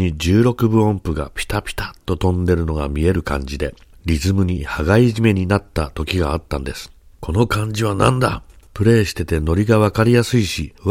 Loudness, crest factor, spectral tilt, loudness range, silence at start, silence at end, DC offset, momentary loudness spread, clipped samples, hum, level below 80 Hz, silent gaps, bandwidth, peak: -18 LUFS; 18 dB; -6.5 dB/octave; 4 LU; 0 s; 0 s; 0.1%; 11 LU; under 0.1%; none; -30 dBFS; none; 16 kHz; 0 dBFS